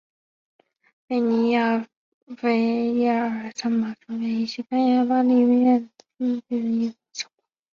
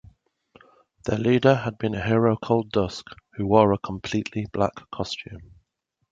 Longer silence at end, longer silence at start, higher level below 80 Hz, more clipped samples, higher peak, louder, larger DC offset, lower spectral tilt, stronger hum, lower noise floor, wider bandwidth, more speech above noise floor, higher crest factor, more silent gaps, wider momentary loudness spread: second, 0.5 s vs 0.65 s; about the same, 1.1 s vs 1.05 s; second, -70 dBFS vs -50 dBFS; neither; second, -10 dBFS vs -2 dBFS; about the same, -22 LUFS vs -24 LUFS; neither; second, -5.5 dB/octave vs -7 dB/octave; neither; second, -57 dBFS vs -76 dBFS; about the same, 7.2 kHz vs 7.8 kHz; second, 36 dB vs 53 dB; second, 14 dB vs 22 dB; first, 1.97-2.27 s vs none; about the same, 14 LU vs 15 LU